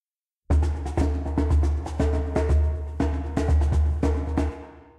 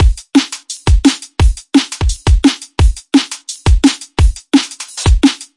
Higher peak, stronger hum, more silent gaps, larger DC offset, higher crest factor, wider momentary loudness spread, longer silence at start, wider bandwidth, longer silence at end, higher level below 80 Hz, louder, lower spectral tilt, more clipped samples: second, -12 dBFS vs 0 dBFS; neither; neither; second, under 0.1% vs 0.3%; about the same, 12 dB vs 12 dB; about the same, 5 LU vs 6 LU; first, 0.5 s vs 0 s; second, 9.2 kHz vs 11.5 kHz; about the same, 0.2 s vs 0.15 s; second, -26 dBFS vs -16 dBFS; second, -25 LUFS vs -14 LUFS; first, -8.5 dB/octave vs -5 dB/octave; neither